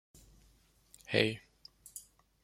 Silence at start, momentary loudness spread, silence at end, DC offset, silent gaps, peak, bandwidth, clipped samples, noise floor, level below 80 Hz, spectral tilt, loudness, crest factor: 1.1 s; 25 LU; 0.45 s; under 0.1%; none; -12 dBFS; 16.5 kHz; under 0.1%; -67 dBFS; -68 dBFS; -4.5 dB/octave; -33 LUFS; 28 dB